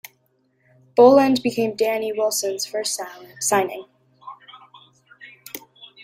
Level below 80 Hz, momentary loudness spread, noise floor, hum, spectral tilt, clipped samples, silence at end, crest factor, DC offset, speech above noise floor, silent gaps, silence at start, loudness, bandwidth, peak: -68 dBFS; 24 LU; -65 dBFS; none; -3 dB/octave; under 0.1%; 0.45 s; 20 dB; under 0.1%; 46 dB; none; 0.95 s; -19 LUFS; 16 kHz; -2 dBFS